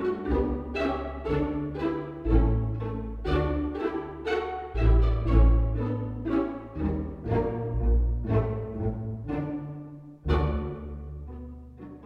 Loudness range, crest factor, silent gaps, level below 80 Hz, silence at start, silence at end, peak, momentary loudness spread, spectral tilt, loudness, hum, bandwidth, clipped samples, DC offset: 4 LU; 18 dB; none; -30 dBFS; 0 s; 0 s; -10 dBFS; 15 LU; -9.5 dB/octave; -29 LUFS; none; 5 kHz; under 0.1%; under 0.1%